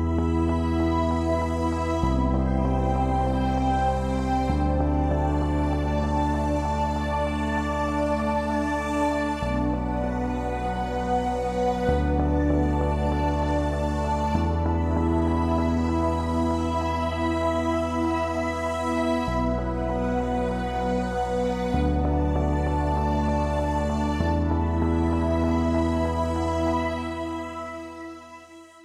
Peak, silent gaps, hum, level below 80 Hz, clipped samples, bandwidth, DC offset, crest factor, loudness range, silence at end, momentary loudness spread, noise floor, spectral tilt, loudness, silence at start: -10 dBFS; none; none; -30 dBFS; under 0.1%; 11 kHz; under 0.1%; 14 dB; 2 LU; 0.05 s; 4 LU; -46 dBFS; -7.5 dB/octave; -25 LUFS; 0 s